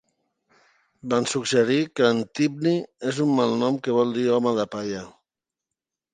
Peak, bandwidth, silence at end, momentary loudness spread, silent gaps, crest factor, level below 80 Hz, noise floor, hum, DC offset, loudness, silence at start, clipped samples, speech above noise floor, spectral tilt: -6 dBFS; 9.8 kHz; 1.05 s; 8 LU; none; 18 dB; -68 dBFS; -87 dBFS; none; under 0.1%; -23 LUFS; 1.05 s; under 0.1%; 64 dB; -5 dB/octave